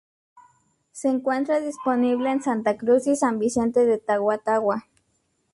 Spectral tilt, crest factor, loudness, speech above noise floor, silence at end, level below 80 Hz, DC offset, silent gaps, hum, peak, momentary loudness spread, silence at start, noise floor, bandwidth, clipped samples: -5 dB/octave; 14 dB; -23 LUFS; 48 dB; 0.75 s; -62 dBFS; under 0.1%; none; none; -8 dBFS; 5 LU; 0.95 s; -70 dBFS; 11.5 kHz; under 0.1%